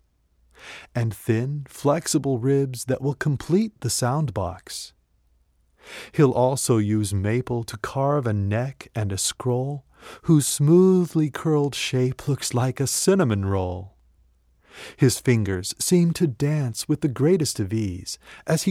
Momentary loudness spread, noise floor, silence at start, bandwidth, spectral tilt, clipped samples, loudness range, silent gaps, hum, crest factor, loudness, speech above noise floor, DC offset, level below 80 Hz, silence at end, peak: 12 LU; -63 dBFS; 0.65 s; 16 kHz; -5.5 dB/octave; under 0.1%; 4 LU; none; none; 16 dB; -23 LUFS; 41 dB; under 0.1%; -54 dBFS; 0 s; -6 dBFS